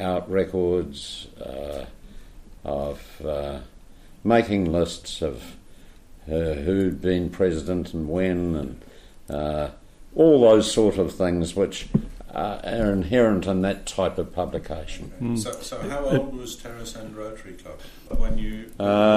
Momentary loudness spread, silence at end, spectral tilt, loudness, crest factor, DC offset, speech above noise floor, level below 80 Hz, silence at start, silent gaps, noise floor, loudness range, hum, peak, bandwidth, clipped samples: 17 LU; 0 s; -6 dB/octave; -24 LUFS; 18 dB; under 0.1%; 22 dB; -36 dBFS; 0 s; none; -46 dBFS; 9 LU; none; -6 dBFS; 15.5 kHz; under 0.1%